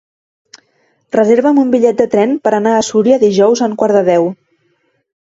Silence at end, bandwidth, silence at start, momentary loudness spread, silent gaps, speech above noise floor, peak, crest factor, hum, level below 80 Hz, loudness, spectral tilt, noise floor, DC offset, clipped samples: 0.9 s; 7.8 kHz; 1.15 s; 4 LU; none; 50 dB; 0 dBFS; 12 dB; none; -58 dBFS; -12 LUFS; -5.5 dB/octave; -60 dBFS; under 0.1%; under 0.1%